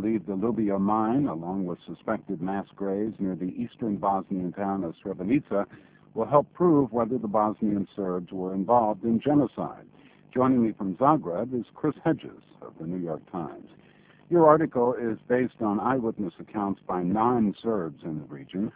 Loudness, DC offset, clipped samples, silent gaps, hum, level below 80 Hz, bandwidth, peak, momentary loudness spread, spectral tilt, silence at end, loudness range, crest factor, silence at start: -27 LUFS; under 0.1%; under 0.1%; none; none; -60 dBFS; 4 kHz; -4 dBFS; 12 LU; -12 dB/octave; 0.05 s; 5 LU; 22 dB; 0 s